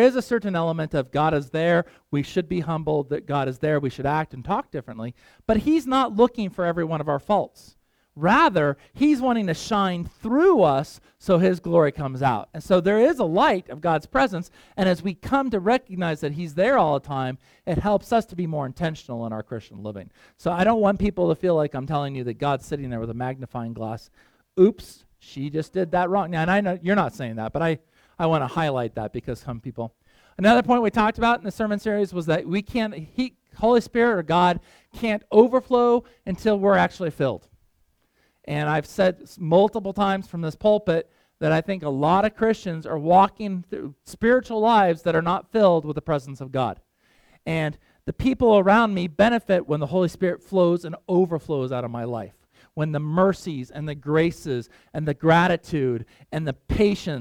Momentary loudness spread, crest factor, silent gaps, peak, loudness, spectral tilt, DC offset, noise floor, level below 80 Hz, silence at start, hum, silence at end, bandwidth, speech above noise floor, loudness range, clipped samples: 13 LU; 20 dB; none; -4 dBFS; -23 LUFS; -7 dB/octave; under 0.1%; -66 dBFS; -48 dBFS; 0 s; none; 0 s; 16 kHz; 44 dB; 5 LU; under 0.1%